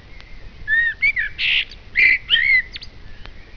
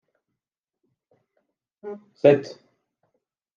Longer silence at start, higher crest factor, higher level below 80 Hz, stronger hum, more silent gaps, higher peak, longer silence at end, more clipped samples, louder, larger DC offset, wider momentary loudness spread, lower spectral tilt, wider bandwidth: second, 0.1 s vs 1.85 s; second, 18 dB vs 24 dB; first, -40 dBFS vs -78 dBFS; neither; neither; about the same, -4 dBFS vs -4 dBFS; second, 0 s vs 1.1 s; neither; first, -16 LUFS vs -20 LUFS; neither; second, 15 LU vs 23 LU; second, -2 dB/octave vs -7.5 dB/octave; second, 5.4 kHz vs 7.2 kHz